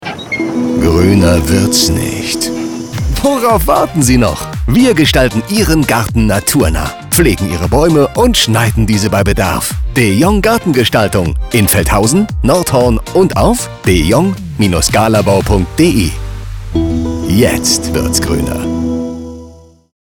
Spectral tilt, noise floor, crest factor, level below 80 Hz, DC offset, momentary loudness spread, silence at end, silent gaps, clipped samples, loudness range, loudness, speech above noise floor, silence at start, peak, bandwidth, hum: -5 dB/octave; -36 dBFS; 12 dB; -22 dBFS; under 0.1%; 7 LU; 0.5 s; none; under 0.1%; 2 LU; -11 LUFS; 26 dB; 0 s; 0 dBFS; over 20 kHz; none